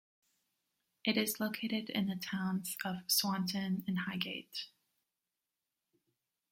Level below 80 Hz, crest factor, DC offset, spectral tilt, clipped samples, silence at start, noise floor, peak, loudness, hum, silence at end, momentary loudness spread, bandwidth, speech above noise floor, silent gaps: -78 dBFS; 22 dB; under 0.1%; -3.5 dB/octave; under 0.1%; 1.05 s; -90 dBFS; -18 dBFS; -36 LUFS; none; 1.85 s; 8 LU; 16.5 kHz; 53 dB; none